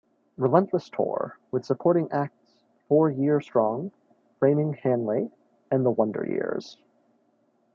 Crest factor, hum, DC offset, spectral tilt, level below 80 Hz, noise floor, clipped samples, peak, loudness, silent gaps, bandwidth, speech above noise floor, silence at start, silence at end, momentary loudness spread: 20 dB; none; under 0.1%; -9.5 dB/octave; -74 dBFS; -67 dBFS; under 0.1%; -6 dBFS; -26 LUFS; none; 7.2 kHz; 43 dB; 0.4 s; 1 s; 10 LU